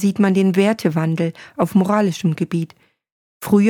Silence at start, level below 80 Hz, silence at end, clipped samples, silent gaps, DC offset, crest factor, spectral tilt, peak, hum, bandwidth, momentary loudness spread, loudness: 0 s; -62 dBFS; 0 s; under 0.1%; 3.12-3.40 s; under 0.1%; 14 dB; -7 dB/octave; -4 dBFS; none; 18.5 kHz; 9 LU; -18 LUFS